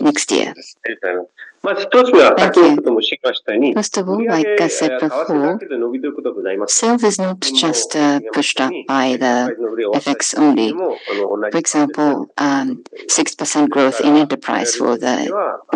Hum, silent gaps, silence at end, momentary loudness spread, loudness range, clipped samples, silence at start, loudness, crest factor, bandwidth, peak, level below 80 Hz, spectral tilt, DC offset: none; none; 0 s; 10 LU; 4 LU; under 0.1%; 0 s; -16 LUFS; 16 dB; 11 kHz; 0 dBFS; -66 dBFS; -3 dB/octave; under 0.1%